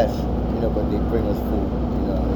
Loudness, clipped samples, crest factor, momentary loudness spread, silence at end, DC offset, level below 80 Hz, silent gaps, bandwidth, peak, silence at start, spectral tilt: -23 LUFS; under 0.1%; 16 dB; 2 LU; 0 s; under 0.1%; -26 dBFS; none; 20 kHz; -6 dBFS; 0 s; -9 dB/octave